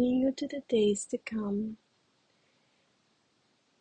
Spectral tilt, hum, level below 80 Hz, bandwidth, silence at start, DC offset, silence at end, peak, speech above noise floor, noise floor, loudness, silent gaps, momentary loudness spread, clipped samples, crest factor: -5 dB/octave; none; -68 dBFS; 10 kHz; 0 s; under 0.1%; 2.05 s; -18 dBFS; 41 dB; -72 dBFS; -31 LUFS; none; 11 LU; under 0.1%; 16 dB